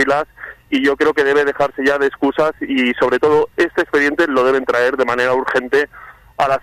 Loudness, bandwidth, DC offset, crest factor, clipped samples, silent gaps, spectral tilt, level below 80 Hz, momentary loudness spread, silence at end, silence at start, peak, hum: -16 LUFS; 14 kHz; under 0.1%; 12 dB; under 0.1%; none; -5 dB/octave; -50 dBFS; 5 LU; 0.05 s; 0 s; -4 dBFS; none